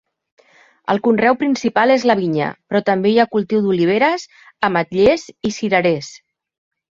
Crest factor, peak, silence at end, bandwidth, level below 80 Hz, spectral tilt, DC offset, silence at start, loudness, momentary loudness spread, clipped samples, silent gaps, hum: 16 dB; 0 dBFS; 0.75 s; 7.6 kHz; -54 dBFS; -5.5 dB/octave; under 0.1%; 0.9 s; -17 LUFS; 8 LU; under 0.1%; none; none